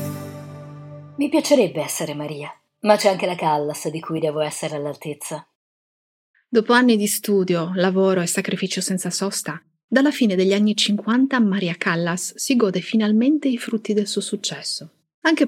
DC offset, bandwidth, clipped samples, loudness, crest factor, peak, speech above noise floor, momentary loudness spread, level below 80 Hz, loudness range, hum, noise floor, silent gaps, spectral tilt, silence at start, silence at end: under 0.1%; 16.5 kHz; under 0.1%; -20 LUFS; 20 dB; -2 dBFS; over 70 dB; 14 LU; -76 dBFS; 3 LU; none; under -90 dBFS; 5.55-6.34 s, 9.84-9.88 s, 15.14-15.22 s; -4.5 dB/octave; 0 s; 0 s